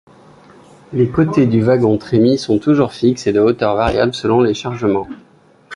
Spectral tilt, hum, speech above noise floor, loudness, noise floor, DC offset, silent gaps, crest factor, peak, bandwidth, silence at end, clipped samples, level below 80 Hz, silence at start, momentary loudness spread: -7 dB/octave; none; 29 dB; -15 LUFS; -43 dBFS; under 0.1%; none; 14 dB; -2 dBFS; 11 kHz; 0 s; under 0.1%; -42 dBFS; 0.9 s; 5 LU